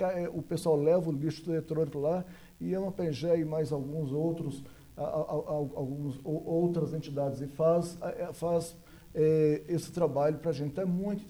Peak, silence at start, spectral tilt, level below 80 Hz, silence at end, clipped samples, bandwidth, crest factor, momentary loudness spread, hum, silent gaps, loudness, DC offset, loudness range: -16 dBFS; 0 s; -8 dB/octave; -60 dBFS; 0 s; under 0.1%; over 20 kHz; 16 dB; 10 LU; none; none; -32 LUFS; under 0.1%; 3 LU